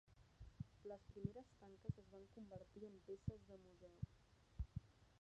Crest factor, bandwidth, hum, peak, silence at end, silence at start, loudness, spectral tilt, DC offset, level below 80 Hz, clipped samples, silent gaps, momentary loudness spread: 24 dB; 8.8 kHz; none; -32 dBFS; 0.05 s; 0.05 s; -57 LUFS; -9 dB/octave; under 0.1%; -62 dBFS; under 0.1%; none; 12 LU